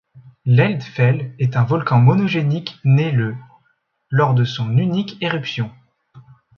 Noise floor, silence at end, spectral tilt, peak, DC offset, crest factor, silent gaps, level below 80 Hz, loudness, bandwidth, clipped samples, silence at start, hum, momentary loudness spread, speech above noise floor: -65 dBFS; 0.4 s; -8 dB/octave; -2 dBFS; under 0.1%; 16 dB; none; -56 dBFS; -18 LUFS; 6.4 kHz; under 0.1%; 0.15 s; none; 10 LU; 48 dB